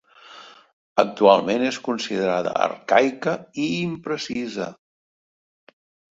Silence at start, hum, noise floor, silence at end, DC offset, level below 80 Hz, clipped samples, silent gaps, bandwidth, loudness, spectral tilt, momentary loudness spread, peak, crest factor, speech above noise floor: 0.3 s; none; -46 dBFS; 1.4 s; under 0.1%; -64 dBFS; under 0.1%; 0.73-0.96 s; 7.8 kHz; -22 LUFS; -5 dB/octave; 13 LU; -2 dBFS; 22 dB; 24 dB